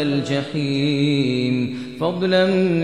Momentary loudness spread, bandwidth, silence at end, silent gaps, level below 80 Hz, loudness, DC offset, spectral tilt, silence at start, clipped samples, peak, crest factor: 7 LU; 10 kHz; 0 s; none; -58 dBFS; -20 LUFS; 0.3%; -7 dB/octave; 0 s; under 0.1%; -6 dBFS; 14 dB